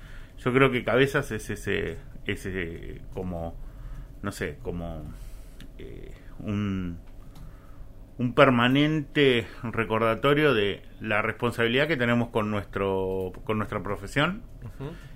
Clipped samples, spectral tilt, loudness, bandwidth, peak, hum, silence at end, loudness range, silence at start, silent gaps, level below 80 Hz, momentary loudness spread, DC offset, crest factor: under 0.1%; -6 dB/octave; -26 LUFS; 16 kHz; -4 dBFS; none; 0 s; 14 LU; 0 s; none; -44 dBFS; 21 LU; under 0.1%; 22 dB